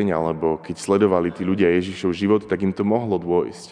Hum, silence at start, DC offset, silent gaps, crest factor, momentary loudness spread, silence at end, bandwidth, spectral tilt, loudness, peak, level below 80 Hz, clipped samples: none; 0 s; under 0.1%; none; 16 dB; 5 LU; 0 s; 10 kHz; -7 dB/octave; -21 LUFS; -4 dBFS; -54 dBFS; under 0.1%